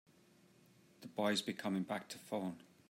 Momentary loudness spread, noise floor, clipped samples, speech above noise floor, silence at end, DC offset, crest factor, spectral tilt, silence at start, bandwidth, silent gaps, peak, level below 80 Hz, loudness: 11 LU; -68 dBFS; under 0.1%; 28 dB; 0.3 s; under 0.1%; 20 dB; -4.5 dB/octave; 1 s; 16 kHz; none; -24 dBFS; -88 dBFS; -41 LUFS